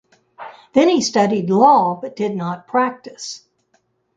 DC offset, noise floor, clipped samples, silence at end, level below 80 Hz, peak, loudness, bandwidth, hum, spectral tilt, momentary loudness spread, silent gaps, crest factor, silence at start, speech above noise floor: under 0.1%; -64 dBFS; under 0.1%; 0.8 s; -64 dBFS; -2 dBFS; -17 LUFS; 9.4 kHz; none; -5 dB/octave; 22 LU; none; 18 dB; 0.4 s; 47 dB